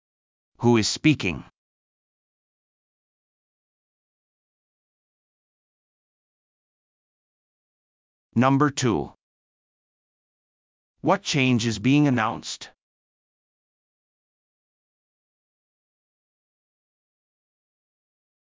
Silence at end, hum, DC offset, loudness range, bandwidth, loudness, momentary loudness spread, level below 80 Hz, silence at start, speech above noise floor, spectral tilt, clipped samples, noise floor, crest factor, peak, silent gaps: 5.8 s; none; under 0.1%; 8 LU; 7.6 kHz; -22 LUFS; 13 LU; -58 dBFS; 0.6 s; over 69 dB; -5 dB/octave; under 0.1%; under -90 dBFS; 24 dB; -6 dBFS; 1.57-8.30 s, 9.21-10.94 s